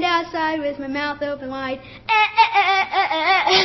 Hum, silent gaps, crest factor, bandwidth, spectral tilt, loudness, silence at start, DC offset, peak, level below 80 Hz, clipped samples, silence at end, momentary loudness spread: none; none; 16 dB; 6.2 kHz; -3 dB/octave; -19 LUFS; 0 s; under 0.1%; -4 dBFS; -54 dBFS; under 0.1%; 0 s; 12 LU